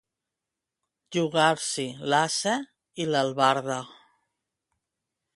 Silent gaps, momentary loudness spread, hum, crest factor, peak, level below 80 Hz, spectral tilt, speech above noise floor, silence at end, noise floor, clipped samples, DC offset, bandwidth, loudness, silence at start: none; 10 LU; none; 22 dB; -6 dBFS; -74 dBFS; -3.5 dB/octave; 62 dB; 1.45 s; -87 dBFS; under 0.1%; under 0.1%; 11.5 kHz; -26 LUFS; 1.1 s